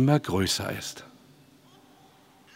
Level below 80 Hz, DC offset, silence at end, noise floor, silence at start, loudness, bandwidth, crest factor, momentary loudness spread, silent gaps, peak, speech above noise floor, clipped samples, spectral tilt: -58 dBFS; under 0.1%; 1.5 s; -57 dBFS; 0 s; -27 LUFS; 16 kHz; 22 dB; 15 LU; none; -8 dBFS; 31 dB; under 0.1%; -5 dB/octave